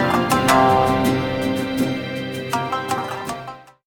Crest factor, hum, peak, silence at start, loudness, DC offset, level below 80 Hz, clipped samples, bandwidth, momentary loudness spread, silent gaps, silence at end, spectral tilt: 18 dB; none; -2 dBFS; 0 s; -20 LUFS; under 0.1%; -44 dBFS; under 0.1%; 18.5 kHz; 13 LU; none; 0.25 s; -5 dB/octave